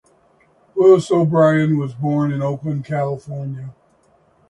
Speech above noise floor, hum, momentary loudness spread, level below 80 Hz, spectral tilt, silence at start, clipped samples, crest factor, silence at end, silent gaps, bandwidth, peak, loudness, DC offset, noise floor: 40 dB; none; 16 LU; -58 dBFS; -8 dB/octave; 0.75 s; under 0.1%; 18 dB; 0.8 s; none; 11 kHz; 0 dBFS; -17 LUFS; under 0.1%; -57 dBFS